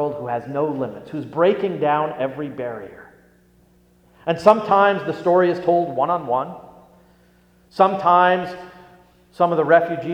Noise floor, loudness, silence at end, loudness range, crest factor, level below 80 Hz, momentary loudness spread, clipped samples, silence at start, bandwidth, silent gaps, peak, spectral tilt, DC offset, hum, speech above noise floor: -55 dBFS; -19 LUFS; 0 s; 5 LU; 20 dB; -62 dBFS; 16 LU; under 0.1%; 0 s; 9.6 kHz; none; 0 dBFS; -7 dB/octave; under 0.1%; 60 Hz at -50 dBFS; 36 dB